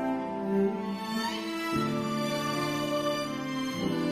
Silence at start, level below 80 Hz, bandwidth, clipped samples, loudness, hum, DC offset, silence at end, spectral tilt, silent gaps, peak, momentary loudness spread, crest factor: 0 s; -62 dBFS; 15.5 kHz; under 0.1%; -31 LUFS; none; under 0.1%; 0 s; -5 dB/octave; none; -18 dBFS; 4 LU; 14 dB